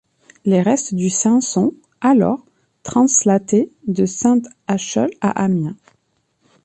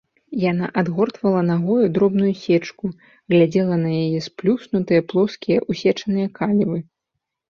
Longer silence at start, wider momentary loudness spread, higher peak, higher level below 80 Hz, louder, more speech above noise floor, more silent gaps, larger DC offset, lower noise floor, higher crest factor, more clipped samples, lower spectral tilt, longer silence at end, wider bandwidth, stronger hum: first, 0.45 s vs 0.3 s; about the same, 8 LU vs 6 LU; about the same, -2 dBFS vs -4 dBFS; about the same, -58 dBFS vs -58 dBFS; first, -17 LUFS vs -20 LUFS; second, 49 dB vs 61 dB; neither; neither; second, -65 dBFS vs -80 dBFS; about the same, 14 dB vs 16 dB; neither; second, -5.5 dB/octave vs -8 dB/octave; first, 0.9 s vs 0.75 s; first, 9 kHz vs 7 kHz; neither